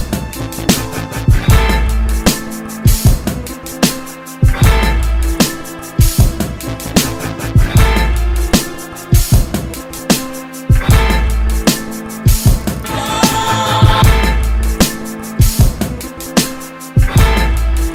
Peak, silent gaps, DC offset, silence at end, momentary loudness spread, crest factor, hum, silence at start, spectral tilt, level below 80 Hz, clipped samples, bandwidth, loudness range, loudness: 0 dBFS; none; under 0.1%; 0 s; 11 LU; 12 dB; none; 0 s; -4.5 dB/octave; -16 dBFS; under 0.1%; 16.5 kHz; 2 LU; -14 LUFS